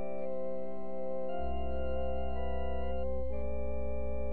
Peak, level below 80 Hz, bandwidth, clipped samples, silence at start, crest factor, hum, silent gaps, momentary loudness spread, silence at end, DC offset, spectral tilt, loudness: -22 dBFS; -40 dBFS; 4.3 kHz; under 0.1%; 0 s; 10 dB; none; none; 3 LU; 0 s; 3%; -7.5 dB/octave; -38 LUFS